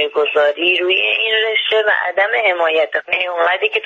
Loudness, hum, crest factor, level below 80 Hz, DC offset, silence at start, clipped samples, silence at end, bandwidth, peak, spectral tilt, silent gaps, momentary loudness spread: -14 LUFS; none; 12 dB; -68 dBFS; under 0.1%; 0 s; under 0.1%; 0 s; 7.6 kHz; -4 dBFS; -2.5 dB/octave; none; 3 LU